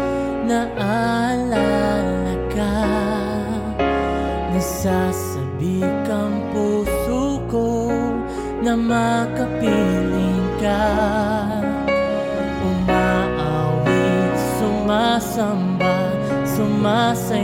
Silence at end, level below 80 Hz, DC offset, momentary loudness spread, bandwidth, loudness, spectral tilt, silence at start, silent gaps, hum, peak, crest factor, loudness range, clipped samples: 0 s; -36 dBFS; under 0.1%; 5 LU; 17 kHz; -20 LUFS; -6 dB/octave; 0 s; none; none; -6 dBFS; 14 dB; 2 LU; under 0.1%